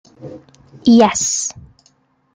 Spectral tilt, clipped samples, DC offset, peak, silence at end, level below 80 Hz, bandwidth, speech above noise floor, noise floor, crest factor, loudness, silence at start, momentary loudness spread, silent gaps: -3.5 dB/octave; under 0.1%; under 0.1%; -2 dBFS; 0.75 s; -54 dBFS; 9.6 kHz; 43 dB; -58 dBFS; 16 dB; -14 LUFS; 0.2 s; 25 LU; none